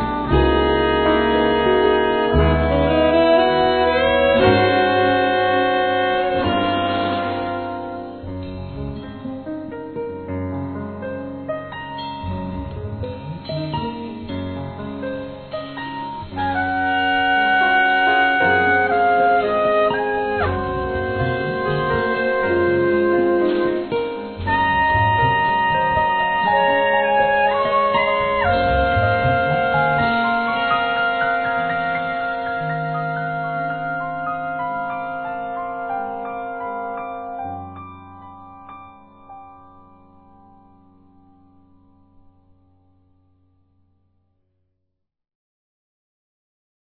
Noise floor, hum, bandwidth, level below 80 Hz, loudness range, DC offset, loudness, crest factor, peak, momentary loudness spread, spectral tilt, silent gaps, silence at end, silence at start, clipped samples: -76 dBFS; none; 4.5 kHz; -36 dBFS; 13 LU; 0.1%; -19 LUFS; 18 dB; -2 dBFS; 14 LU; -9.5 dB/octave; none; 7.35 s; 0 s; under 0.1%